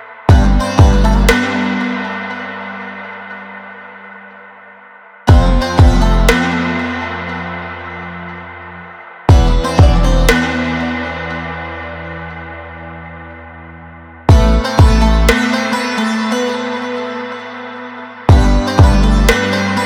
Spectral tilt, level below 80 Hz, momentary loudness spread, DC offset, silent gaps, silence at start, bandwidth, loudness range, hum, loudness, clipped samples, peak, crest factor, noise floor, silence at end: -6 dB/octave; -16 dBFS; 20 LU; under 0.1%; none; 0 s; 16.5 kHz; 9 LU; none; -13 LUFS; under 0.1%; 0 dBFS; 14 dB; -39 dBFS; 0 s